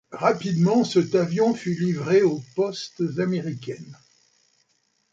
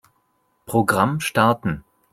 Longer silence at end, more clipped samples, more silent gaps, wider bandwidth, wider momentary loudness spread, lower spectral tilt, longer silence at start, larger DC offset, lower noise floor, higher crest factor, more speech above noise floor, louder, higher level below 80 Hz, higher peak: first, 1.2 s vs 0.35 s; neither; neither; second, 7.8 kHz vs 16 kHz; about the same, 10 LU vs 9 LU; about the same, -6.5 dB/octave vs -5.5 dB/octave; second, 0.1 s vs 0.7 s; neither; about the same, -69 dBFS vs -67 dBFS; about the same, 18 dB vs 20 dB; about the same, 47 dB vs 47 dB; second, -23 LUFS vs -20 LUFS; second, -68 dBFS vs -52 dBFS; second, -6 dBFS vs -2 dBFS